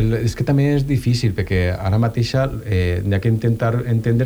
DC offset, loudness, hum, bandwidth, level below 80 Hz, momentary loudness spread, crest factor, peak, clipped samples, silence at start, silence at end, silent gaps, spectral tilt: under 0.1%; -19 LUFS; none; over 20 kHz; -34 dBFS; 3 LU; 12 dB; -6 dBFS; under 0.1%; 0 s; 0 s; none; -7.5 dB/octave